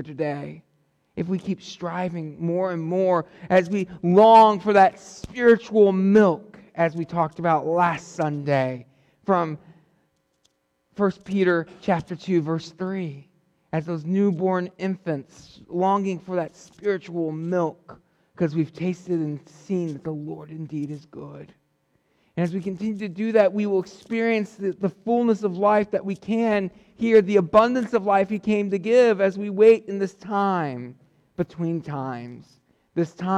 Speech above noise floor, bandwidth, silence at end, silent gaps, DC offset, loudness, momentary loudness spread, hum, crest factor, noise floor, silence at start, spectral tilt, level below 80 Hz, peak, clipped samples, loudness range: 47 dB; 9.6 kHz; 0 s; none; under 0.1%; -22 LUFS; 15 LU; none; 18 dB; -69 dBFS; 0 s; -7.5 dB/octave; -62 dBFS; -6 dBFS; under 0.1%; 10 LU